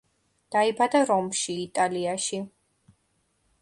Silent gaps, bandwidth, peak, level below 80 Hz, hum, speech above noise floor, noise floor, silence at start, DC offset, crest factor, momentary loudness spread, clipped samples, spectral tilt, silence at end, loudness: none; 11.5 kHz; -10 dBFS; -70 dBFS; none; 46 dB; -71 dBFS; 0.5 s; under 0.1%; 18 dB; 8 LU; under 0.1%; -3.5 dB/octave; 1.15 s; -25 LUFS